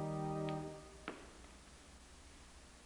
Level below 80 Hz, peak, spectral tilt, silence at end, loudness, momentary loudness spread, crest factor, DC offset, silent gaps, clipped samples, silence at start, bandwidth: -62 dBFS; -26 dBFS; -6 dB/octave; 0 s; -45 LUFS; 18 LU; 20 dB; under 0.1%; none; under 0.1%; 0 s; 12 kHz